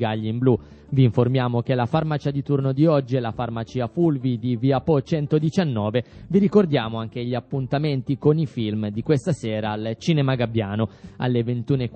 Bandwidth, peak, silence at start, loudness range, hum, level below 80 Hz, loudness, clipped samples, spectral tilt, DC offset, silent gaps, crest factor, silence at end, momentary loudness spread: 8.4 kHz; -4 dBFS; 0 s; 2 LU; none; -52 dBFS; -22 LUFS; under 0.1%; -8 dB/octave; under 0.1%; none; 18 dB; 0 s; 8 LU